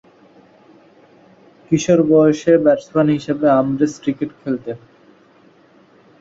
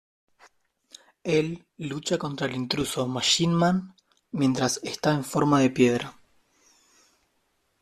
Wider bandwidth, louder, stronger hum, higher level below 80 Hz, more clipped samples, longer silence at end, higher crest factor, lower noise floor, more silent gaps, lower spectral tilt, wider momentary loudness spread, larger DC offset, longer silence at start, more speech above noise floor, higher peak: second, 7.8 kHz vs 14 kHz; first, -16 LUFS vs -25 LUFS; neither; about the same, -56 dBFS vs -60 dBFS; neither; second, 1.45 s vs 1.7 s; about the same, 16 dB vs 20 dB; second, -50 dBFS vs -72 dBFS; neither; first, -7 dB/octave vs -4.5 dB/octave; about the same, 12 LU vs 12 LU; neither; first, 1.7 s vs 1.25 s; second, 35 dB vs 47 dB; first, -2 dBFS vs -6 dBFS